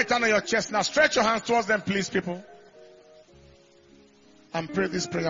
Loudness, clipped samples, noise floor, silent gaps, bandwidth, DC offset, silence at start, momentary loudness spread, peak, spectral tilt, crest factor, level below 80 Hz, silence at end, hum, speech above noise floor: -25 LUFS; under 0.1%; -56 dBFS; none; 7.6 kHz; under 0.1%; 0 s; 13 LU; -6 dBFS; -3.5 dB/octave; 22 dB; -60 dBFS; 0 s; none; 31 dB